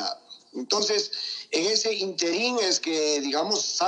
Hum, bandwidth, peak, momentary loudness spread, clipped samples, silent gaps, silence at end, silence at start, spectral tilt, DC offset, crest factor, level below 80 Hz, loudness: none; 9.8 kHz; -8 dBFS; 9 LU; under 0.1%; none; 0 s; 0 s; -1 dB/octave; under 0.1%; 18 dB; under -90 dBFS; -25 LUFS